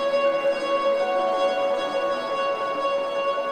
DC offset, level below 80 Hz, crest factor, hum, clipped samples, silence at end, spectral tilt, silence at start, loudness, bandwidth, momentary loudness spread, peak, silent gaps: under 0.1%; -64 dBFS; 12 dB; none; under 0.1%; 0 s; -3 dB/octave; 0 s; -24 LUFS; 9.4 kHz; 3 LU; -10 dBFS; none